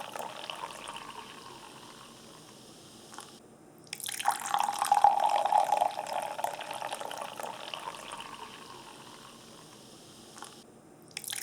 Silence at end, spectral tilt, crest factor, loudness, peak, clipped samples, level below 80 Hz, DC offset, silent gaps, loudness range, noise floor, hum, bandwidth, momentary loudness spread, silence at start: 0 s; -1.5 dB/octave; 28 dB; -32 LUFS; -8 dBFS; under 0.1%; -76 dBFS; under 0.1%; none; 17 LU; -54 dBFS; none; over 20 kHz; 24 LU; 0 s